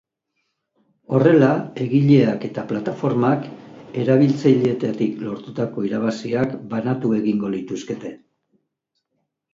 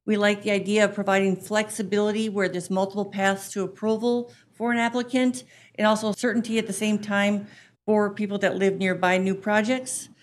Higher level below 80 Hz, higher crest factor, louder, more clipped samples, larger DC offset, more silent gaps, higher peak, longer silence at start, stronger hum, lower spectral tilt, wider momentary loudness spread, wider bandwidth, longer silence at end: first, -62 dBFS vs -70 dBFS; about the same, 20 dB vs 18 dB; first, -20 LUFS vs -24 LUFS; neither; neither; neither; first, -2 dBFS vs -6 dBFS; first, 1.1 s vs 0.05 s; neither; first, -8.5 dB/octave vs -4.5 dB/octave; first, 14 LU vs 6 LU; second, 7.6 kHz vs 13.5 kHz; first, 1.4 s vs 0.15 s